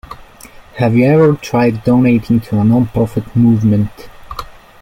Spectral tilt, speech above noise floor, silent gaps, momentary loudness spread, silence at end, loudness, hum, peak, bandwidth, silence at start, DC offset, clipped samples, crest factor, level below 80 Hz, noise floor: -8.5 dB/octave; 26 dB; none; 19 LU; 0.3 s; -13 LUFS; none; -2 dBFS; 15.5 kHz; 0.1 s; under 0.1%; under 0.1%; 12 dB; -40 dBFS; -38 dBFS